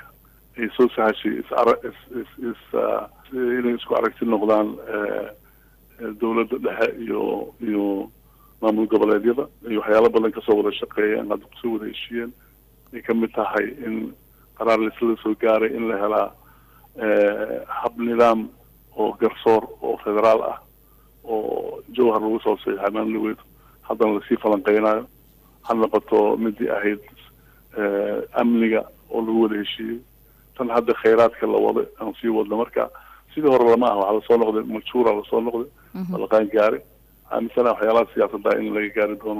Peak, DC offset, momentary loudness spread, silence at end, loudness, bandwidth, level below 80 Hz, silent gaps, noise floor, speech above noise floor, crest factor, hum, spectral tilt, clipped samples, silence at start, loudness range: -6 dBFS; under 0.1%; 12 LU; 0 s; -22 LUFS; 15.5 kHz; -56 dBFS; none; -53 dBFS; 32 dB; 14 dB; none; -7 dB/octave; under 0.1%; 0.55 s; 4 LU